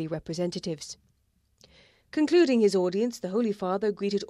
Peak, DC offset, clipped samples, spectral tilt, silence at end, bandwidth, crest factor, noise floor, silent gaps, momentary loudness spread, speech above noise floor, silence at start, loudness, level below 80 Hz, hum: -12 dBFS; under 0.1%; under 0.1%; -5.5 dB/octave; 0.05 s; 12.5 kHz; 16 dB; -70 dBFS; none; 14 LU; 44 dB; 0 s; -26 LUFS; -64 dBFS; none